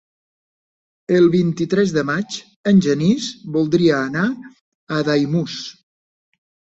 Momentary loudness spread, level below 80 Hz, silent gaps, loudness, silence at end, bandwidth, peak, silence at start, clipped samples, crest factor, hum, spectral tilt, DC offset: 13 LU; -58 dBFS; 2.56-2.64 s, 4.61-4.87 s; -18 LUFS; 1 s; 8 kHz; -4 dBFS; 1.1 s; under 0.1%; 16 dB; none; -6.5 dB/octave; under 0.1%